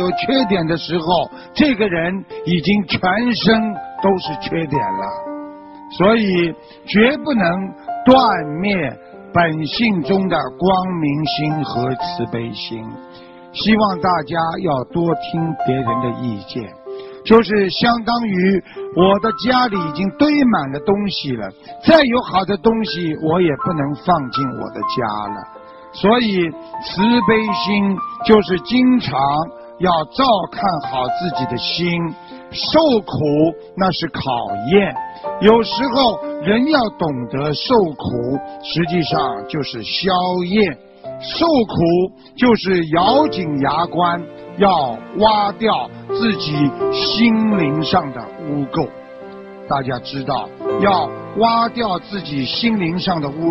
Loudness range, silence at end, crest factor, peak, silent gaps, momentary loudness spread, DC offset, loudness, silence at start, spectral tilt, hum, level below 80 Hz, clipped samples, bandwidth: 4 LU; 0 s; 16 dB; 0 dBFS; none; 11 LU; under 0.1%; -17 LUFS; 0 s; -8 dB/octave; none; -46 dBFS; under 0.1%; 6 kHz